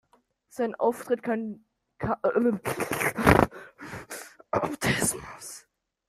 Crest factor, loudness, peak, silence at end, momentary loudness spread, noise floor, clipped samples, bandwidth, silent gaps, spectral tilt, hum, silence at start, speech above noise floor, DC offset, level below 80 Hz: 26 dB; -26 LUFS; -2 dBFS; 0.5 s; 20 LU; -65 dBFS; under 0.1%; 15.5 kHz; none; -4.5 dB/octave; none; 0.55 s; 39 dB; under 0.1%; -48 dBFS